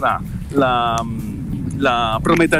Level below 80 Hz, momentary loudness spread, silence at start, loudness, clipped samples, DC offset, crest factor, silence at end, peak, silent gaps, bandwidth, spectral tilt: -34 dBFS; 9 LU; 0 s; -19 LUFS; under 0.1%; under 0.1%; 14 dB; 0 s; -4 dBFS; none; 16 kHz; -5.5 dB/octave